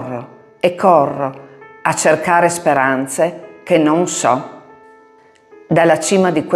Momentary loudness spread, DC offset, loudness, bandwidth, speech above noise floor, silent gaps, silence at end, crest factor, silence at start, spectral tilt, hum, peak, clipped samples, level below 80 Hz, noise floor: 11 LU; under 0.1%; -15 LUFS; 15 kHz; 34 dB; none; 0 s; 16 dB; 0 s; -4.5 dB/octave; none; 0 dBFS; under 0.1%; -64 dBFS; -48 dBFS